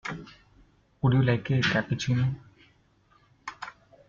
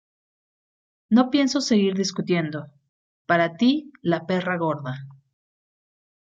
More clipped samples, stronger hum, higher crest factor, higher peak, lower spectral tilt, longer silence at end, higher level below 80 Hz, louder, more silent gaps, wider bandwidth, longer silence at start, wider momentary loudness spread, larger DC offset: neither; neither; about the same, 18 dB vs 18 dB; second, -12 dBFS vs -6 dBFS; about the same, -6.5 dB/octave vs -5.5 dB/octave; second, 0.4 s vs 1.15 s; first, -54 dBFS vs -68 dBFS; second, -26 LUFS vs -22 LUFS; second, none vs 2.89-3.25 s; about the same, 7.2 kHz vs 7.8 kHz; second, 0.05 s vs 1.1 s; first, 19 LU vs 12 LU; neither